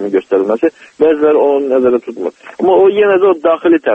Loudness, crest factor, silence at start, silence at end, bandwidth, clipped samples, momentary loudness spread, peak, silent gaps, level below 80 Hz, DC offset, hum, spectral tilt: -11 LUFS; 10 dB; 0 s; 0 s; 3.8 kHz; under 0.1%; 8 LU; 0 dBFS; none; -56 dBFS; under 0.1%; none; -7 dB/octave